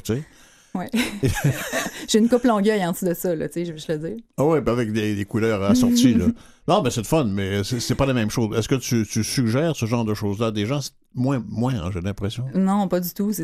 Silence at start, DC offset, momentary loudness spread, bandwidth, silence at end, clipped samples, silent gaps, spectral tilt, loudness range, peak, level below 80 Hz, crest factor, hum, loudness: 0.05 s; under 0.1%; 10 LU; 15.5 kHz; 0 s; under 0.1%; none; -5.5 dB/octave; 4 LU; -4 dBFS; -44 dBFS; 18 dB; none; -22 LUFS